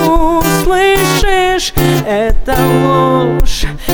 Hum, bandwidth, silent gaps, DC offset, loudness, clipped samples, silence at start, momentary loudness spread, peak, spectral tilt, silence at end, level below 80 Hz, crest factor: none; over 20 kHz; none; under 0.1%; -11 LUFS; under 0.1%; 0 s; 5 LU; 0 dBFS; -5 dB/octave; 0 s; -18 dBFS; 10 dB